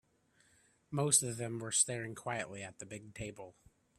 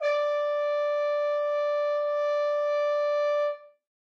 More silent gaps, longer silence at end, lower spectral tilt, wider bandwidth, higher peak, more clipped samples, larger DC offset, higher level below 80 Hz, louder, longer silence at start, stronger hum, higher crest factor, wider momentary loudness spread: neither; first, 0.5 s vs 0.35 s; first, -3 dB/octave vs 2 dB/octave; first, 15.5 kHz vs 6.6 kHz; about the same, -14 dBFS vs -16 dBFS; neither; neither; first, -70 dBFS vs under -90 dBFS; second, -34 LUFS vs -27 LUFS; first, 0.9 s vs 0 s; neither; first, 24 dB vs 10 dB; first, 18 LU vs 1 LU